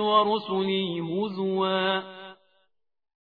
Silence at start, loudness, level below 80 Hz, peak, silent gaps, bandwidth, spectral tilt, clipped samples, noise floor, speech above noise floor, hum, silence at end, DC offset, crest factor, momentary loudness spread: 0 s; -26 LUFS; -74 dBFS; -8 dBFS; none; 5 kHz; -8.5 dB/octave; under 0.1%; -73 dBFS; 47 dB; none; 1.05 s; under 0.1%; 18 dB; 17 LU